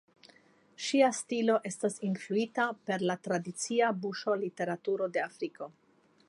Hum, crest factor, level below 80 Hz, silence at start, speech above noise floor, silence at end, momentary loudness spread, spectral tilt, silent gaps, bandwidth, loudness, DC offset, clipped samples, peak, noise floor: none; 20 dB; -86 dBFS; 0.8 s; 31 dB; 0.6 s; 10 LU; -4.5 dB/octave; none; 11.5 kHz; -32 LUFS; under 0.1%; under 0.1%; -14 dBFS; -63 dBFS